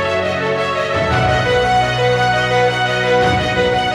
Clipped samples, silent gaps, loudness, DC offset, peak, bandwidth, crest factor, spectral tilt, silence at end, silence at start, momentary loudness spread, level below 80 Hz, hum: under 0.1%; none; -15 LUFS; under 0.1%; -2 dBFS; 12.5 kHz; 12 dB; -5 dB/octave; 0 s; 0 s; 3 LU; -34 dBFS; none